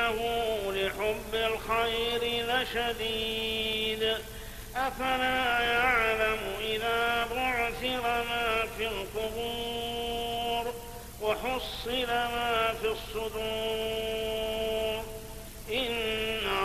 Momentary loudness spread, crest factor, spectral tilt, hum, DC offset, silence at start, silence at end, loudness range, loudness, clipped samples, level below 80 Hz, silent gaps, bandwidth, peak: 7 LU; 18 dB; -3 dB/octave; none; under 0.1%; 0 s; 0 s; 5 LU; -30 LUFS; under 0.1%; -46 dBFS; none; 15 kHz; -12 dBFS